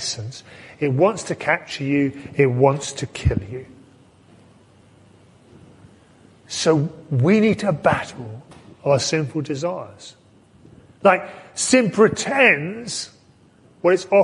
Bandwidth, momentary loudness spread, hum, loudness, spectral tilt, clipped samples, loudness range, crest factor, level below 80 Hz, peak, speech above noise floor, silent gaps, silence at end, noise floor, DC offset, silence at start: 11.5 kHz; 17 LU; none; -20 LUFS; -5 dB/octave; under 0.1%; 8 LU; 20 dB; -44 dBFS; 0 dBFS; 33 dB; none; 0 s; -53 dBFS; under 0.1%; 0 s